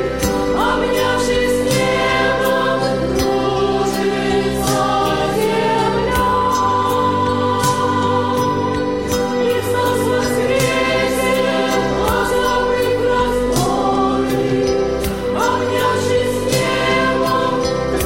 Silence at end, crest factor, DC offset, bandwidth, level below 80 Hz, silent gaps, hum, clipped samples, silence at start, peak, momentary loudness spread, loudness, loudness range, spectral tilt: 0 s; 12 dB; 0.9%; 16.5 kHz; -34 dBFS; none; none; under 0.1%; 0 s; -4 dBFS; 2 LU; -16 LUFS; 1 LU; -4.5 dB/octave